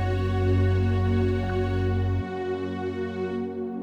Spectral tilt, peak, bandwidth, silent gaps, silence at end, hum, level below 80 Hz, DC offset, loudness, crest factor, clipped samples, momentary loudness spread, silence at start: -9 dB/octave; -14 dBFS; 6.4 kHz; none; 0 s; none; -38 dBFS; under 0.1%; -26 LUFS; 12 dB; under 0.1%; 7 LU; 0 s